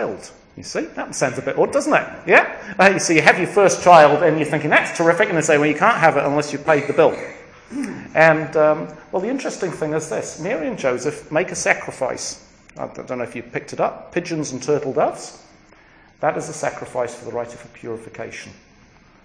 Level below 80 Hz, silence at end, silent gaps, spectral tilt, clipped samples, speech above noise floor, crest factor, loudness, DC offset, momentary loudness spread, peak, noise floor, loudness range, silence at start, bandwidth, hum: -56 dBFS; 0.7 s; none; -4.5 dB/octave; under 0.1%; 32 dB; 20 dB; -18 LUFS; under 0.1%; 18 LU; 0 dBFS; -50 dBFS; 11 LU; 0 s; 10.5 kHz; none